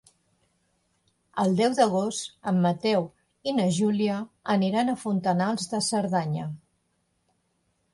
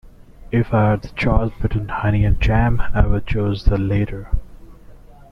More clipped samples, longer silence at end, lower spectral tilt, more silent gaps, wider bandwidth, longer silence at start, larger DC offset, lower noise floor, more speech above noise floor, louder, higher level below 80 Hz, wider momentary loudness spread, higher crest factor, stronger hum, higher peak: neither; first, 1.35 s vs 0.35 s; second, -5.5 dB/octave vs -9 dB/octave; neither; first, 11.5 kHz vs 6.2 kHz; first, 1.35 s vs 0.05 s; neither; first, -73 dBFS vs -41 dBFS; first, 48 dB vs 25 dB; second, -26 LUFS vs -20 LUFS; second, -68 dBFS vs -24 dBFS; first, 10 LU vs 6 LU; about the same, 18 dB vs 16 dB; neither; second, -8 dBFS vs -2 dBFS